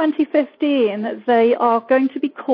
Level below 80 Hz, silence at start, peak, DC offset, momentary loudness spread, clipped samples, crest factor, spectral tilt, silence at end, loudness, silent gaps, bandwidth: -72 dBFS; 0 s; -4 dBFS; under 0.1%; 6 LU; under 0.1%; 14 dB; -8 dB/octave; 0 s; -18 LUFS; none; 5.2 kHz